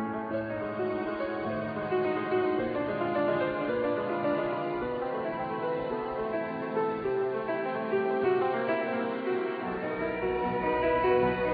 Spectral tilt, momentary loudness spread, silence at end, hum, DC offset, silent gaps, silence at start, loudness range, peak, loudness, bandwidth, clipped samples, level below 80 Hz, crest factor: -9.5 dB/octave; 6 LU; 0 s; none; under 0.1%; none; 0 s; 2 LU; -14 dBFS; -30 LUFS; 5 kHz; under 0.1%; -56 dBFS; 16 dB